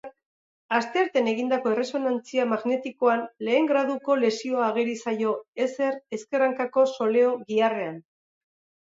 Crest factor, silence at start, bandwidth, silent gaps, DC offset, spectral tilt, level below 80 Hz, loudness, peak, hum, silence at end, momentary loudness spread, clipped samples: 16 dB; 0.05 s; 7.8 kHz; 0.26-0.69 s, 5.48-5.53 s; under 0.1%; -4.5 dB/octave; -80 dBFS; -25 LUFS; -8 dBFS; none; 0.8 s; 6 LU; under 0.1%